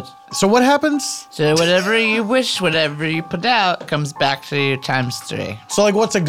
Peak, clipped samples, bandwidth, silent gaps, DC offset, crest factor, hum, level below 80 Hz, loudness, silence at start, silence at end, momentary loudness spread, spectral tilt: -2 dBFS; under 0.1%; 17 kHz; none; 0.2%; 16 dB; none; -58 dBFS; -17 LUFS; 0 s; 0 s; 9 LU; -4 dB/octave